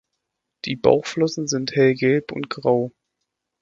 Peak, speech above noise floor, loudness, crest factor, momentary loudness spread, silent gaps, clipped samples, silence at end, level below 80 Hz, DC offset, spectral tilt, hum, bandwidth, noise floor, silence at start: 0 dBFS; 59 dB; -21 LUFS; 22 dB; 12 LU; none; under 0.1%; 0.7 s; -58 dBFS; under 0.1%; -5 dB/octave; none; 7.8 kHz; -79 dBFS; 0.65 s